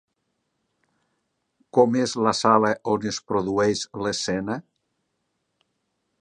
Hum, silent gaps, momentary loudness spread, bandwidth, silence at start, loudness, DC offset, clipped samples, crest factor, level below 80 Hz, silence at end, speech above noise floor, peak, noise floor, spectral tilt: none; none; 8 LU; 10.5 kHz; 1.75 s; -23 LUFS; under 0.1%; under 0.1%; 22 dB; -60 dBFS; 1.6 s; 54 dB; -2 dBFS; -76 dBFS; -4.5 dB/octave